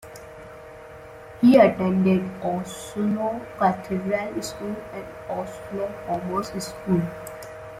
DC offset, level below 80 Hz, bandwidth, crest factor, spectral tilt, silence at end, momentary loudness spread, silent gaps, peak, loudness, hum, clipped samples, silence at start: under 0.1%; -54 dBFS; 15.5 kHz; 20 dB; -6.5 dB/octave; 0 s; 24 LU; none; -4 dBFS; -24 LUFS; none; under 0.1%; 0.05 s